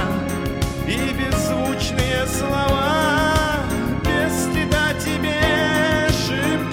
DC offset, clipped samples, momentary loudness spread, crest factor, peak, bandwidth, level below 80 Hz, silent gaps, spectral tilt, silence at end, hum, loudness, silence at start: under 0.1%; under 0.1%; 5 LU; 16 dB; -4 dBFS; over 20 kHz; -32 dBFS; none; -4.5 dB/octave; 0 s; none; -20 LUFS; 0 s